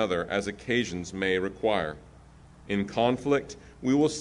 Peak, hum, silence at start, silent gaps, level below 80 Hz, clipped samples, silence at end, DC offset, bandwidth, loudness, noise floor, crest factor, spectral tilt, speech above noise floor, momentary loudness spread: -10 dBFS; none; 0 s; none; -54 dBFS; under 0.1%; 0 s; under 0.1%; 11 kHz; -28 LUFS; -52 dBFS; 18 dB; -5 dB/octave; 24 dB; 9 LU